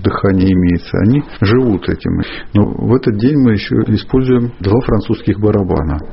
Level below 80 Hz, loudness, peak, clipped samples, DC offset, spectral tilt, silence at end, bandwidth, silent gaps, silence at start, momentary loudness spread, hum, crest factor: -30 dBFS; -14 LUFS; 0 dBFS; under 0.1%; under 0.1%; -7.5 dB/octave; 0 s; 5.8 kHz; none; 0 s; 5 LU; none; 12 dB